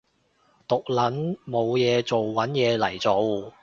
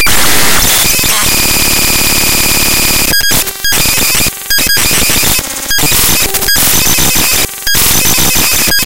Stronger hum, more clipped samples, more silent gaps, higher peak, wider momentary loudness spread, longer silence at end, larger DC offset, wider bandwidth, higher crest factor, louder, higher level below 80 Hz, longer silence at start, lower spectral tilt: neither; second, under 0.1% vs 2%; neither; second, -8 dBFS vs 0 dBFS; about the same, 6 LU vs 4 LU; first, 0.15 s vs 0 s; second, under 0.1% vs 10%; second, 7.6 kHz vs over 20 kHz; first, 16 dB vs 10 dB; second, -24 LUFS vs -7 LUFS; second, -62 dBFS vs -24 dBFS; first, 0.7 s vs 0 s; first, -6 dB/octave vs -1 dB/octave